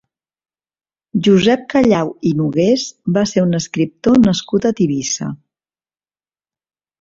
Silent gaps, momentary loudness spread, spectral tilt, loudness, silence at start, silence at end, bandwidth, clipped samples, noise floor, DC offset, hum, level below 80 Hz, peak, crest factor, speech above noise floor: none; 8 LU; -5.5 dB/octave; -15 LUFS; 1.15 s; 1.65 s; 7.8 kHz; under 0.1%; under -90 dBFS; under 0.1%; none; -50 dBFS; -2 dBFS; 16 dB; over 75 dB